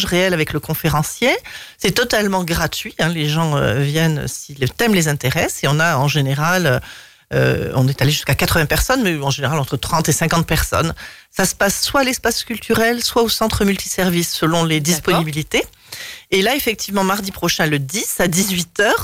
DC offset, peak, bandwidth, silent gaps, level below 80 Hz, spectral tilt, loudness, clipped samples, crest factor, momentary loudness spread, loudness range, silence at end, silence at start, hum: 0.2%; -4 dBFS; 16.5 kHz; none; -36 dBFS; -4 dB/octave; -17 LUFS; under 0.1%; 14 dB; 5 LU; 1 LU; 0 s; 0 s; none